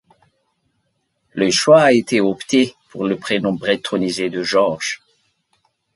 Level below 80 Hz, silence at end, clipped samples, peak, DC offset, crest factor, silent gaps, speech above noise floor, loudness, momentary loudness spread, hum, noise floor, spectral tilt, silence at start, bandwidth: -60 dBFS; 1 s; under 0.1%; 0 dBFS; under 0.1%; 18 dB; none; 52 dB; -17 LUFS; 13 LU; none; -69 dBFS; -4 dB/octave; 1.35 s; 11.5 kHz